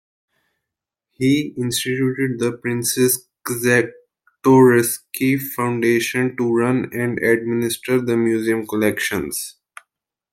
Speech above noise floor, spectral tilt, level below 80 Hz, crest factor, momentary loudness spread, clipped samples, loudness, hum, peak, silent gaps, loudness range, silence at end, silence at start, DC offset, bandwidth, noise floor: 65 dB; -5 dB/octave; -60 dBFS; 18 dB; 7 LU; under 0.1%; -19 LUFS; none; -2 dBFS; none; 4 LU; 0.8 s; 1.2 s; under 0.1%; 16.5 kHz; -84 dBFS